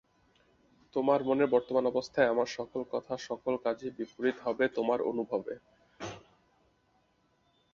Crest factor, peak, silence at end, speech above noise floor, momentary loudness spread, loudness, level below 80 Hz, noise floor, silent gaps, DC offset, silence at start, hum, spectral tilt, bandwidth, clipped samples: 20 dB; -12 dBFS; 1.55 s; 41 dB; 16 LU; -31 LUFS; -70 dBFS; -71 dBFS; none; under 0.1%; 0.95 s; none; -5.5 dB/octave; 7.4 kHz; under 0.1%